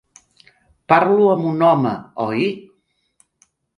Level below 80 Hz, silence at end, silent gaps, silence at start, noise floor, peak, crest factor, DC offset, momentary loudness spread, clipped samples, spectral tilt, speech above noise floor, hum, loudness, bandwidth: -64 dBFS; 1.2 s; none; 0.9 s; -64 dBFS; 0 dBFS; 18 dB; under 0.1%; 9 LU; under 0.1%; -7.5 dB/octave; 48 dB; none; -17 LUFS; 11 kHz